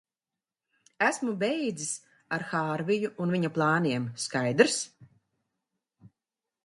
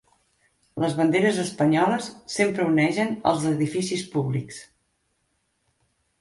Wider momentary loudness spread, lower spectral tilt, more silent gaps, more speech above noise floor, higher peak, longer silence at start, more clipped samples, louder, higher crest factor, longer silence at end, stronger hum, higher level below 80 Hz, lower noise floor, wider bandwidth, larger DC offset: about the same, 10 LU vs 10 LU; about the same, -4.5 dB/octave vs -5.5 dB/octave; neither; first, over 62 dB vs 49 dB; about the same, -6 dBFS vs -6 dBFS; first, 1 s vs 0.75 s; neither; second, -28 LUFS vs -23 LUFS; first, 24 dB vs 18 dB; second, 0.6 s vs 1.55 s; neither; second, -74 dBFS vs -62 dBFS; first, under -90 dBFS vs -72 dBFS; about the same, 11.5 kHz vs 11.5 kHz; neither